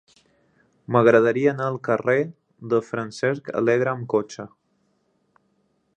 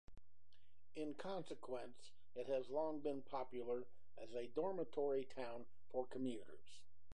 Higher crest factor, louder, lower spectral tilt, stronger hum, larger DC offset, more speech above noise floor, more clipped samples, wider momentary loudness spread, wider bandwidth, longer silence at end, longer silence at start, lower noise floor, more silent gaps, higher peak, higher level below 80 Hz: about the same, 22 dB vs 18 dB; first, -22 LUFS vs -47 LUFS; about the same, -7 dB/octave vs -6 dB/octave; neither; second, under 0.1% vs 0.4%; first, 47 dB vs 32 dB; neither; about the same, 16 LU vs 18 LU; second, 9.4 kHz vs 11 kHz; first, 1.5 s vs 0 s; first, 0.9 s vs 0.05 s; second, -68 dBFS vs -79 dBFS; neither; first, -2 dBFS vs -30 dBFS; first, -68 dBFS vs -76 dBFS